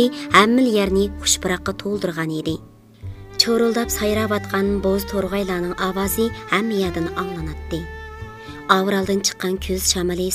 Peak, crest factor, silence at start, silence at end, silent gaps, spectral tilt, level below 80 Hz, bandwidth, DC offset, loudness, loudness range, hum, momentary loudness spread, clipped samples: 0 dBFS; 20 dB; 0 s; 0 s; none; -3.5 dB/octave; -38 dBFS; 16 kHz; under 0.1%; -20 LUFS; 3 LU; none; 16 LU; under 0.1%